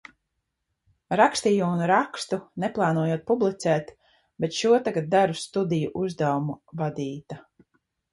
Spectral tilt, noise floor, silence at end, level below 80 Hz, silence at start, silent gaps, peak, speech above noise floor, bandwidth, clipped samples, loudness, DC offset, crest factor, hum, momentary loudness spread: -5.5 dB/octave; -79 dBFS; 0.7 s; -64 dBFS; 1.1 s; none; -4 dBFS; 55 dB; 11.5 kHz; under 0.1%; -25 LUFS; under 0.1%; 20 dB; none; 11 LU